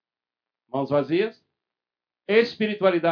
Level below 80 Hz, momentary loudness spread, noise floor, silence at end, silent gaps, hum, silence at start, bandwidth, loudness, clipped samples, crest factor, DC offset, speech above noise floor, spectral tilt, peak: -74 dBFS; 10 LU; under -90 dBFS; 0 s; none; none; 0.75 s; 5.4 kHz; -23 LUFS; under 0.1%; 20 dB; under 0.1%; over 68 dB; -7.5 dB/octave; -6 dBFS